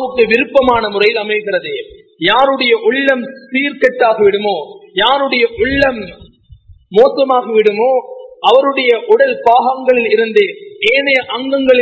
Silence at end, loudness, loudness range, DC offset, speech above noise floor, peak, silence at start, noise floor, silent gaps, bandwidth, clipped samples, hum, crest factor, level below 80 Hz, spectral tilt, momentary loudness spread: 0 s; -12 LUFS; 2 LU; under 0.1%; 29 dB; 0 dBFS; 0 s; -41 dBFS; none; 8 kHz; 0.3%; none; 12 dB; -44 dBFS; -5.5 dB/octave; 8 LU